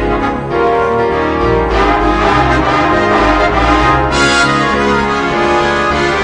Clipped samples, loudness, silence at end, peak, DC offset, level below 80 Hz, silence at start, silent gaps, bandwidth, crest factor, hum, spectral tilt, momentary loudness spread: under 0.1%; -11 LUFS; 0 s; 0 dBFS; under 0.1%; -24 dBFS; 0 s; none; 10 kHz; 12 dB; none; -5 dB/octave; 3 LU